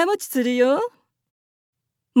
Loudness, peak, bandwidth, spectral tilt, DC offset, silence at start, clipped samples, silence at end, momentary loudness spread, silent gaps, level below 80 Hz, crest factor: -21 LUFS; -6 dBFS; 17 kHz; -3.5 dB/octave; under 0.1%; 0 s; under 0.1%; 0 s; 6 LU; 1.30-1.73 s; -88 dBFS; 16 dB